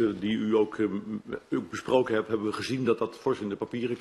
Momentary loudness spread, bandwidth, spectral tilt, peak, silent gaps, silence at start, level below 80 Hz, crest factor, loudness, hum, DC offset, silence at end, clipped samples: 7 LU; 12.5 kHz; -6 dB/octave; -10 dBFS; none; 0 s; -64 dBFS; 18 dB; -29 LUFS; none; under 0.1%; 0 s; under 0.1%